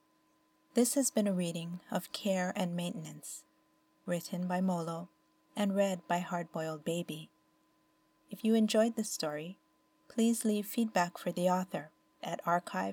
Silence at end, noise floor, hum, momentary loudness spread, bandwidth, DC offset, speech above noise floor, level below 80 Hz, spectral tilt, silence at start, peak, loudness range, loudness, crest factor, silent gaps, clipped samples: 0 s; -72 dBFS; none; 14 LU; over 20 kHz; under 0.1%; 39 dB; -86 dBFS; -5 dB/octave; 0.75 s; -16 dBFS; 4 LU; -34 LUFS; 18 dB; none; under 0.1%